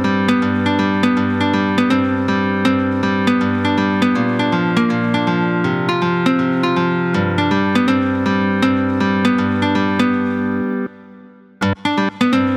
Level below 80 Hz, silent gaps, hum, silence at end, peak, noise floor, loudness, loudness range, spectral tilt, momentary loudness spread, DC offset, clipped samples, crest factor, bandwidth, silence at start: -56 dBFS; none; none; 0 s; -2 dBFS; -42 dBFS; -17 LUFS; 2 LU; -6.5 dB/octave; 3 LU; under 0.1%; under 0.1%; 14 dB; 11 kHz; 0 s